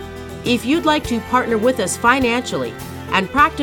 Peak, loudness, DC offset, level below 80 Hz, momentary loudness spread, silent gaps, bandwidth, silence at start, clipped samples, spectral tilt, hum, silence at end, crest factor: 0 dBFS; -18 LUFS; under 0.1%; -40 dBFS; 11 LU; none; 19 kHz; 0 s; under 0.1%; -4 dB/octave; none; 0 s; 18 dB